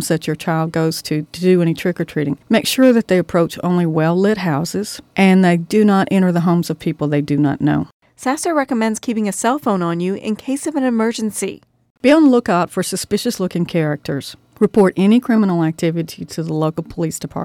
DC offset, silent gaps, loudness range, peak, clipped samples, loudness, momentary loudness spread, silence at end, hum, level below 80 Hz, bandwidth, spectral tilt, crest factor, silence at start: under 0.1%; 7.93-8.00 s, 11.90-11.95 s; 3 LU; -2 dBFS; under 0.1%; -17 LUFS; 10 LU; 0 s; none; -52 dBFS; 17 kHz; -6 dB/octave; 14 dB; 0 s